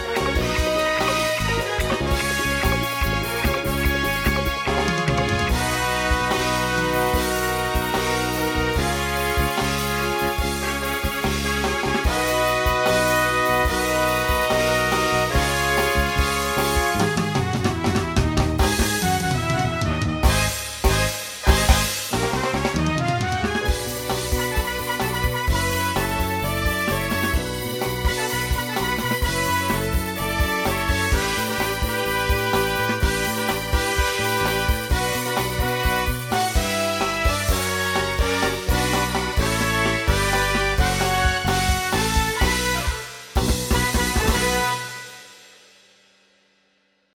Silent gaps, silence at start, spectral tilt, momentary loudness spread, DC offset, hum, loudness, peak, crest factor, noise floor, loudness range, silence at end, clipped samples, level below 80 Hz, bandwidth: none; 0 s; -4 dB/octave; 4 LU; under 0.1%; none; -21 LUFS; -2 dBFS; 20 dB; -65 dBFS; 3 LU; 1.75 s; under 0.1%; -28 dBFS; 17.5 kHz